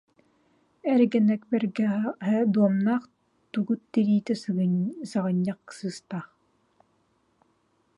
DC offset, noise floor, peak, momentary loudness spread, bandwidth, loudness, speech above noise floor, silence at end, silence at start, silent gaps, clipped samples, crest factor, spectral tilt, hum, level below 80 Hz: under 0.1%; -69 dBFS; -10 dBFS; 13 LU; 11 kHz; -26 LUFS; 44 dB; 1.7 s; 0.85 s; none; under 0.1%; 16 dB; -8 dB/octave; none; -76 dBFS